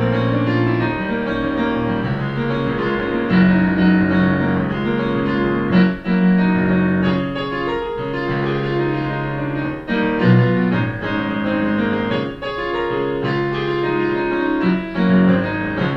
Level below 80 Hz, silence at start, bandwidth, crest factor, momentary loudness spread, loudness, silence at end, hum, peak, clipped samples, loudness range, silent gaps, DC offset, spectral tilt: -40 dBFS; 0 s; 5.6 kHz; 16 dB; 7 LU; -18 LUFS; 0 s; none; -2 dBFS; under 0.1%; 4 LU; none; under 0.1%; -9 dB/octave